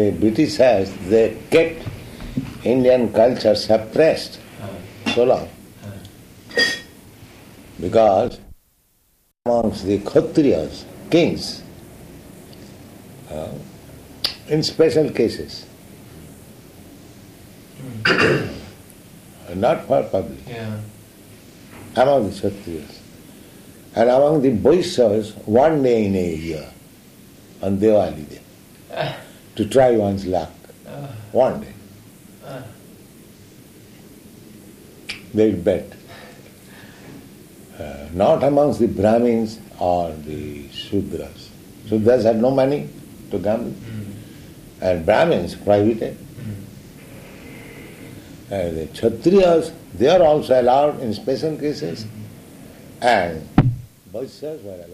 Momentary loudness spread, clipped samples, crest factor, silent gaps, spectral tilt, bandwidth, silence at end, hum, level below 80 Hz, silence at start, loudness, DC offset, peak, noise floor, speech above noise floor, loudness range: 23 LU; under 0.1%; 18 dB; none; -6 dB/octave; 15.5 kHz; 0 s; none; -48 dBFS; 0 s; -19 LUFS; under 0.1%; -2 dBFS; -62 dBFS; 44 dB; 8 LU